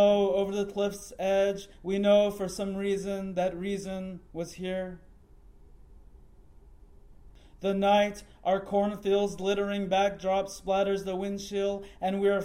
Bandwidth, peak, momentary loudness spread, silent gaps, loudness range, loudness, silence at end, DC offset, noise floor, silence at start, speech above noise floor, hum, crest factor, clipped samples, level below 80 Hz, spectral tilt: 16 kHz; -12 dBFS; 11 LU; none; 12 LU; -29 LUFS; 0 s; under 0.1%; -54 dBFS; 0 s; 25 dB; none; 18 dB; under 0.1%; -54 dBFS; -5.5 dB/octave